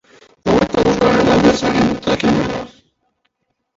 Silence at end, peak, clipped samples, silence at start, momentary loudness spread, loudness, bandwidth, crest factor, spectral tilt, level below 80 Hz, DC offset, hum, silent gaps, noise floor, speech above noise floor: 1.1 s; 0 dBFS; under 0.1%; 0.45 s; 12 LU; -15 LUFS; 8 kHz; 16 dB; -5.5 dB/octave; -38 dBFS; under 0.1%; none; none; -68 dBFS; 53 dB